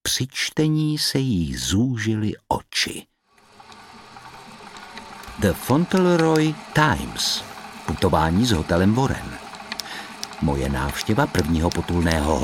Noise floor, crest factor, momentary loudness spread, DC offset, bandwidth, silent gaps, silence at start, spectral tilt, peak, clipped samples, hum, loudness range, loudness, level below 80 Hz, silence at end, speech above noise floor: -52 dBFS; 20 dB; 18 LU; under 0.1%; 17 kHz; none; 0.05 s; -5 dB/octave; -2 dBFS; under 0.1%; none; 7 LU; -22 LUFS; -38 dBFS; 0 s; 31 dB